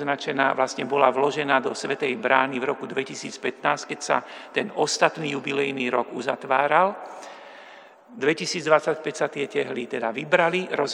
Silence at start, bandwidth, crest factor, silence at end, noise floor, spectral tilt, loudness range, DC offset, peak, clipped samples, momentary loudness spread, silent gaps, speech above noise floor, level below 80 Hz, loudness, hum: 0 s; 11 kHz; 24 dB; 0 s; -47 dBFS; -3.5 dB/octave; 2 LU; under 0.1%; -2 dBFS; under 0.1%; 9 LU; none; 23 dB; -80 dBFS; -24 LUFS; none